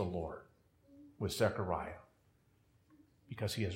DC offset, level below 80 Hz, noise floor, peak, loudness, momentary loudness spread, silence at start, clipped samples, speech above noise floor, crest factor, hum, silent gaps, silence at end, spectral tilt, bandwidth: under 0.1%; -64 dBFS; -71 dBFS; -18 dBFS; -39 LUFS; 18 LU; 0 s; under 0.1%; 35 dB; 24 dB; none; none; 0 s; -5.5 dB/octave; 16 kHz